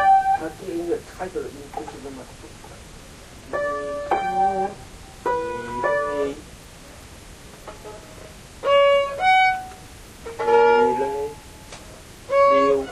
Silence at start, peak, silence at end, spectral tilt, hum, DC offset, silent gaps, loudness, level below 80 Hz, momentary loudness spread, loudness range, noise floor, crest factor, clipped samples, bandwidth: 0 s; -6 dBFS; 0 s; -4 dB/octave; none; under 0.1%; none; -21 LUFS; -48 dBFS; 26 LU; 10 LU; -42 dBFS; 18 dB; under 0.1%; 13.5 kHz